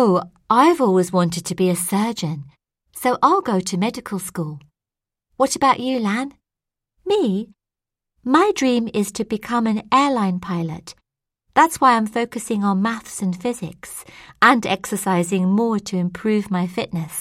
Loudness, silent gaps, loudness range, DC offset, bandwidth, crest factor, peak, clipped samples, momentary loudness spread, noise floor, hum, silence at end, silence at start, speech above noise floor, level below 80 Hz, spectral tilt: -19 LUFS; none; 3 LU; under 0.1%; 16 kHz; 20 dB; 0 dBFS; under 0.1%; 14 LU; -87 dBFS; none; 0 s; 0 s; 68 dB; -58 dBFS; -5 dB/octave